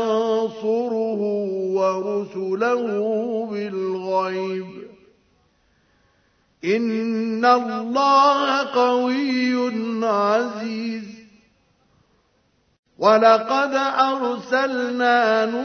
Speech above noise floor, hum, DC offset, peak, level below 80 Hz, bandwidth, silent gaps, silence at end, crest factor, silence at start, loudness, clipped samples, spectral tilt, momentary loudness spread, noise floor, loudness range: 44 dB; none; under 0.1%; -2 dBFS; -72 dBFS; 6.6 kHz; 12.79-12.83 s; 0 s; 20 dB; 0 s; -20 LUFS; under 0.1%; -5 dB/octave; 11 LU; -64 dBFS; 8 LU